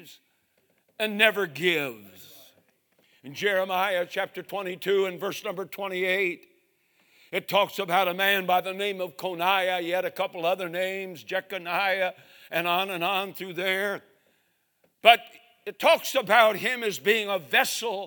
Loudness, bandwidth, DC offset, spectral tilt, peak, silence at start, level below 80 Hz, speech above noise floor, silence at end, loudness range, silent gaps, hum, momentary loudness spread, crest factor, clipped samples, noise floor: -25 LUFS; 19.5 kHz; under 0.1%; -3 dB/octave; 0 dBFS; 0 s; -82 dBFS; 45 dB; 0 s; 6 LU; none; none; 12 LU; 26 dB; under 0.1%; -71 dBFS